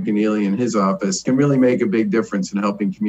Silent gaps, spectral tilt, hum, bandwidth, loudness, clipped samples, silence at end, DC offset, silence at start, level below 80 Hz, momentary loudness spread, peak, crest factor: none; -6 dB/octave; none; 8.6 kHz; -18 LUFS; under 0.1%; 0 s; under 0.1%; 0 s; -60 dBFS; 6 LU; -6 dBFS; 12 dB